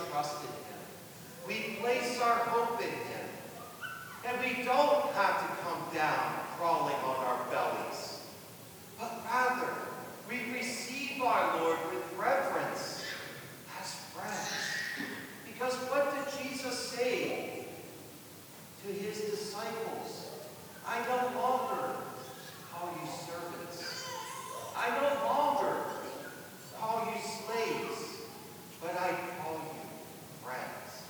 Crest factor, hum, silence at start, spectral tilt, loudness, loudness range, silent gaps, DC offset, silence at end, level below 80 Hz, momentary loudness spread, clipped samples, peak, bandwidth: 20 dB; none; 0 s; -3.5 dB/octave; -35 LUFS; 6 LU; none; under 0.1%; 0 s; -78 dBFS; 16 LU; under 0.1%; -14 dBFS; over 20 kHz